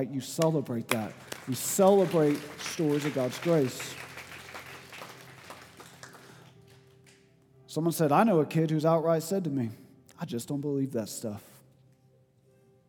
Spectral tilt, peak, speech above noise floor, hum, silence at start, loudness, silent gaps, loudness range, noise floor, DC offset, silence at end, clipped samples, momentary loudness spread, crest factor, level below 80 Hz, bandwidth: -5.5 dB/octave; -8 dBFS; 36 dB; none; 0 s; -28 LUFS; none; 17 LU; -64 dBFS; under 0.1%; 1.5 s; under 0.1%; 23 LU; 22 dB; -76 dBFS; 19 kHz